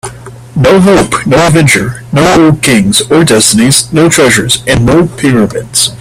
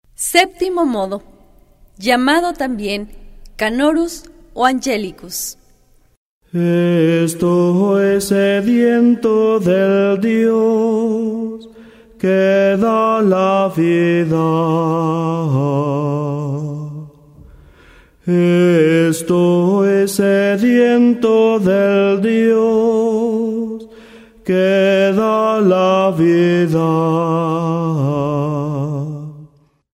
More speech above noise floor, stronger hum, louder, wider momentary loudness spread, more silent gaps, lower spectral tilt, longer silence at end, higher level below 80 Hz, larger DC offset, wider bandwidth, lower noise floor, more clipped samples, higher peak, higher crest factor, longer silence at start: second, 19 dB vs 38 dB; neither; first, -6 LUFS vs -15 LUFS; second, 5 LU vs 11 LU; second, none vs 6.17-6.41 s; second, -4 dB/octave vs -6 dB/octave; second, 0.05 s vs 0.5 s; first, -32 dBFS vs -48 dBFS; neither; first, over 20 kHz vs 16 kHz; second, -26 dBFS vs -51 dBFS; first, 0.5% vs under 0.1%; about the same, 0 dBFS vs 0 dBFS; second, 6 dB vs 14 dB; second, 0.05 s vs 0.2 s